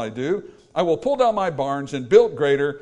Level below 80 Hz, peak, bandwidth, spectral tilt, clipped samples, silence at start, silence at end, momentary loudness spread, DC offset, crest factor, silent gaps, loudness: -56 dBFS; -2 dBFS; 9.6 kHz; -6 dB/octave; under 0.1%; 0 s; 0.05 s; 10 LU; under 0.1%; 18 dB; none; -21 LUFS